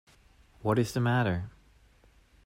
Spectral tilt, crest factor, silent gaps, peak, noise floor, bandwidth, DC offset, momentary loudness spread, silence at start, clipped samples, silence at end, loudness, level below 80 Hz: -6.5 dB/octave; 18 dB; none; -14 dBFS; -61 dBFS; 16 kHz; under 0.1%; 9 LU; 0.6 s; under 0.1%; 0.95 s; -29 LUFS; -58 dBFS